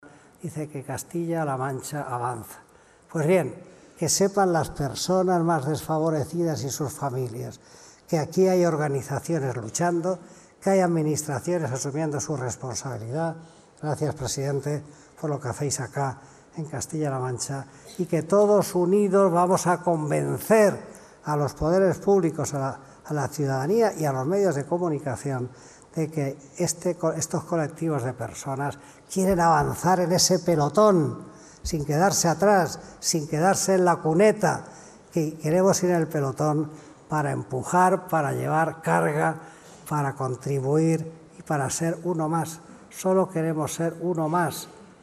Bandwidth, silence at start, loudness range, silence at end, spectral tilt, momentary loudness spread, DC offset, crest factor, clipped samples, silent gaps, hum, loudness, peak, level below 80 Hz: 14.5 kHz; 0.05 s; 7 LU; 0.15 s; -5 dB/octave; 13 LU; under 0.1%; 18 dB; under 0.1%; none; none; -25 LUFS; -6 dBFS; -54 dBFS